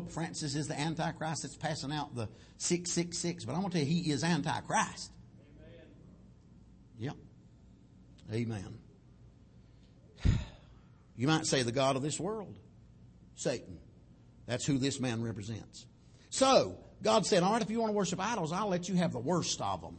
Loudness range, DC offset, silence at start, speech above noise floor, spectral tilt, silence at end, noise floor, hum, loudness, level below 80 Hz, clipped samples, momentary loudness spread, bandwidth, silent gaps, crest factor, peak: 14 LU; under 0.1%; 0 s; 26 dB; -4.5 dB/octave; 0 s; -59 dBFS; none; -33 LUFS; -52 dBFS; under 0.1%; 17 LU; 8.8 kHz; none; 22 dB; -14 dBFS